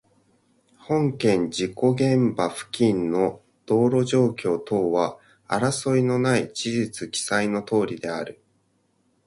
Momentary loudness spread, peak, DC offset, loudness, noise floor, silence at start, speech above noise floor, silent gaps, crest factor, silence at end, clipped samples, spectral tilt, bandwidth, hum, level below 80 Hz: 7 LU; -6 dBFS; under 0.1%; -23 LUFS; -67 dBFS; 0.9 s; 45 dB; none; 18 dB; 0.95 s; under 0.1%; -5.5 dB/octave; 11.5 kHz; none; -60 dBFS